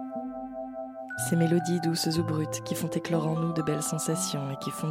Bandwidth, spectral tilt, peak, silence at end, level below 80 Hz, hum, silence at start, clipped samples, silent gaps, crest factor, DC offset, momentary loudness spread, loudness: 16.5 kHz; -5 dB/octave; -12 dBFS; 0 s; -64 dBFS; none; 0 s; under 0.1%; none; 16 dB; under 0.1%; 12 LU; -29 LUFS